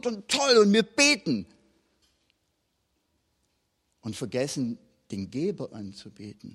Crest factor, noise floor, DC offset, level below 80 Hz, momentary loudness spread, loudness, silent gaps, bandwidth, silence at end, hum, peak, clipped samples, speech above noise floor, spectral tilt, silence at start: 20 dB; -75 dBFS; under 0.1%; -68 dBFS; 23 LU; -24 LUFS; none; 13.5 kHz; 0.05 s; none; -8 dBFS; under 0.1%; 49 dB; -3.5 dB/octave; 0.05 s